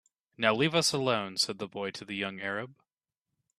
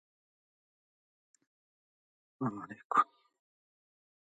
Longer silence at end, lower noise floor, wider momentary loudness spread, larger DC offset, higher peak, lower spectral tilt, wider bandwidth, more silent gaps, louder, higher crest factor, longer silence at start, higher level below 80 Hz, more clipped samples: second, 0.85 s vs 1.2 s; about the same, -89 dBFS vs under -90 dBFS; about the same, 11 LU vs 9 LU; neither; first, -8 dBFS vs -14 dBFS; second, -3.5 dB/octave vs -6.5 dB/octave; first, 13 kHz vs 9 kHz; second, none vs 2.85-2.90 s; first, -30 LUFS vs -34 LUFS; about the same, 24 dB vs 26 dB; second, 0.4 s vs 2.4 s; first, -72 dBFS vs -88 dBFS; neither